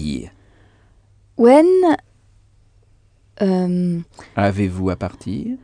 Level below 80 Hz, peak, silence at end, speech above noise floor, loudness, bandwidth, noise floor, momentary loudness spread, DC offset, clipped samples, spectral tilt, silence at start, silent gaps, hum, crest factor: -46 dBFS; 0 dBFS; 0.05 s; 38 dB; -17 LUFS; 10 kHz; -54 dBFS; 16 LU; under 0.1%; under 0.1%; -8 dB/octave; 0 s; none; none; 18 dB